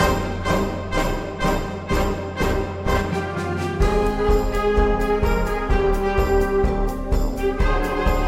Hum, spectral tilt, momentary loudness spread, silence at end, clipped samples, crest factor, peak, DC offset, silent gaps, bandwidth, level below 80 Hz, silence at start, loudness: none; -6 dB/octave; 5 LU; 0 s; under 0.1%; 14 dB; -6 dBFS; under 0.1%; none; 15.5 kHz; -24 dBFS; 0 s; -22 LUFS